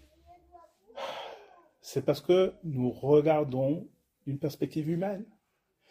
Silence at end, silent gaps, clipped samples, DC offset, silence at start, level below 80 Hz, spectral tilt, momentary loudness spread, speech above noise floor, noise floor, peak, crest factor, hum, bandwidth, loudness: 0.65 s; none; under 0.1%; under 0.1%; 0.55 s; -66 dBFS; -7.5 dB/octave; 19 LU; 47 dB; -76 dBFS; -12 dBFS; 18 dB; none; 15.5 kHz; -29 LUFS